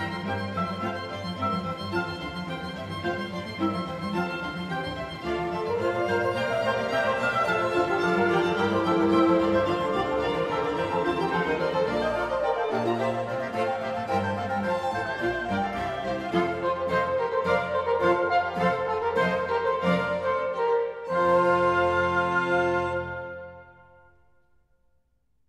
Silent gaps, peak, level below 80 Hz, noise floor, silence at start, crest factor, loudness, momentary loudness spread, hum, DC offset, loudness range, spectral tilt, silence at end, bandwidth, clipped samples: none; -10 dBFS; -54 dBFS; -71 dBFS; 0 s; 16 dB; -26 LUFS; 9 LU; none; under 0.1%; 7 LU; -6.5 dB/octave; 1.8 s; 13 kHz; under 0.1%